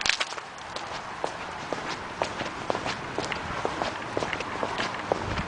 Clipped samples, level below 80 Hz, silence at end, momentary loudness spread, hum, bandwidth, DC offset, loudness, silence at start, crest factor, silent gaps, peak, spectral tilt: under 0.1%; -50 dBFS; 0 s; 6 LU; none; 10.5 kHz; under 0.1%; -31 LUFS; 0 s; 30 dB; none; 0 dBFS; -3 dB/octave